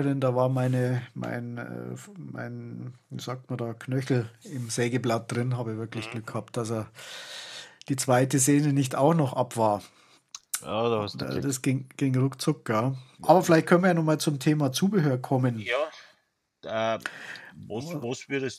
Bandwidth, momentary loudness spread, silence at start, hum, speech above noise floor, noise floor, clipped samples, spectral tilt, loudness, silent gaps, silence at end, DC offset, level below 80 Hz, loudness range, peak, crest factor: 15 kHz; 17 LU; 0 s; none; 45 dB; -72 dBFS; under 0.1%; -5.5 dB/octave; -27 LUFS; none; 0 s; under 0.1%; -72 dBFS; 9 LU; -4 dBFS; 22 dB